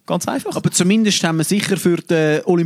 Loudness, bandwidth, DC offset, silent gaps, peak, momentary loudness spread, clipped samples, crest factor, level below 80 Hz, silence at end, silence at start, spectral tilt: -17 LUFS; 15.5 kHz; under 0.1%; none; -2 dBFS; 6 LU; under 0.1%; 16 dB; -60 dBFS; 0 s; 0.1 s; -4.5 dB/octave